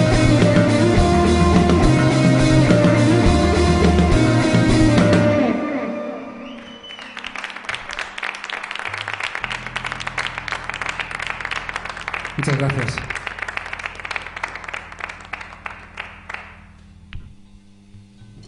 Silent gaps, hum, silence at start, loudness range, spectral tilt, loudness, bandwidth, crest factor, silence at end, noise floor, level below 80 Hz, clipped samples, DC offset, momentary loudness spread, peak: none; none; 0 s; 16 LU; -6 dB/octave; -18 LUFS; 11 kHz; 16 dB; 0.05 s; -46 dBFS; -30 dBFS; under 0.1%; under 0.1%; 18 LU; -2 dBFS